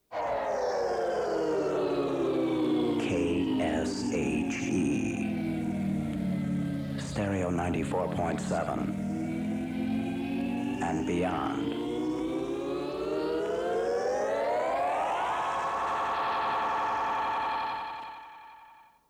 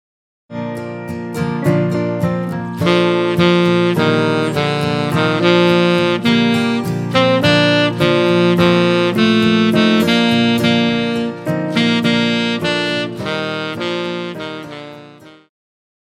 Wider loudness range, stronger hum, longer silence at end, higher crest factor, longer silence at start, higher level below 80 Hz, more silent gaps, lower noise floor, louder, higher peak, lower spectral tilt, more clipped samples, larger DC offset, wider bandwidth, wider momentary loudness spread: second, 3 LU vs 6 LU; neither; second, 0.35 s vs 0.75 s; second, 10 dB vs 16 dB; second, 0.1 s vs 0.5 s; about the same, -54 dBFS vs -52 dBFS; neither; first, -56 dBFS vs -40 dBFS; second, -30 LUFS vs -15 LUFS; second, -20 dBFS vs 0 dBFS; about the same, -6 dB/octave vs -6 dB/octave; neither; neither; about the same, 15 kHz vs 14.5 kHz; second, 4 LU vs 12 LU